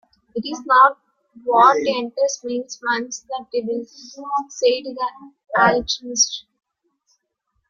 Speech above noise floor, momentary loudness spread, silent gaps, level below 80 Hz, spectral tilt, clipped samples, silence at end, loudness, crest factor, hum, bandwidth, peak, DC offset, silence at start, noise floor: 53 dB; 16 LU; none; -58 dBFS; -2 dB/octave; under 0.1%; 1.3 s; -19 LUFS; 20 dB; none; 7.6 kHz; -2 dBFS; under 0.1%; 0.35 s; -73 dBFS